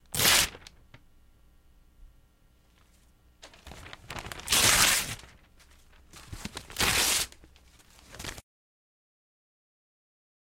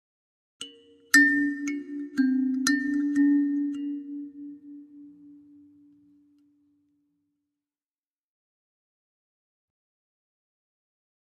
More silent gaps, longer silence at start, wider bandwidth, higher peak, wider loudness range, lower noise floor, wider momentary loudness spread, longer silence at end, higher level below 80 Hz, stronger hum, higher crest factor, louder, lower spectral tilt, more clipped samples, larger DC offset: neither; second, 0.15 s vs 0.6 s; first, 16.5 kHz vs 12 kHz; about the same, -6 dBFS vs -4 dBFS; second, 14 LU vs 18 LU; second, -62 dBFS vs under -90 dBFS; about the same, 26 LU vs 24 LU; second, 2 s vs 6.05 s; first, -50 dBFS vs -80 dBFS; neither; about the same, 26 dB vs 26 dB; about the same, -24 LUFS vs -24 LUFS; about the same, -0.5 dB/octave vs -1.5 dB/octave; neither; neither